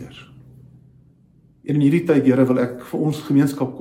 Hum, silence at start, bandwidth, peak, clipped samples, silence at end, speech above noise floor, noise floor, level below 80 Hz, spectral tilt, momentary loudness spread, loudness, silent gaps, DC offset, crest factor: none; 0 s; 16 kHz; -4 dBFS; under 0.1%; 0 s; 36 dB; -54 dBFS; -58 dBFS; -8 dB/octave; 8 LU; -19 LUFS; none; under 0.1%; 16 dB